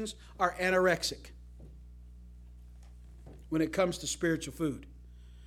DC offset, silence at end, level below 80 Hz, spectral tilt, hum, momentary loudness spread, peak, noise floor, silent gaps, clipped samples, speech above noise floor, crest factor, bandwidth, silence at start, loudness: under 0.1%; 0 s; -52 dBFS; -4 dB/octave; 60 Hz at -50 dBFS; 26 LU; -12 dBFS; -51 dBFS; none; under 0.1%; 19 dB; 22 dB; 16.5 kHz; 0 s; -31 LUFS